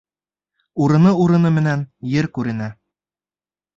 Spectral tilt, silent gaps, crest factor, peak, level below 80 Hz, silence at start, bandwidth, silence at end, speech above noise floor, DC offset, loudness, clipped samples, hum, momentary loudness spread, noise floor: -8.5 dB/octave; none; 16 dB; -4 dBFS; -54 dBFS; 0.75 s; 7.4 kHz; 1.05 s; over 74 dB; under 0.1%; -17 LUFS; under 0.1%; none; 13 LU; under -90 dBFS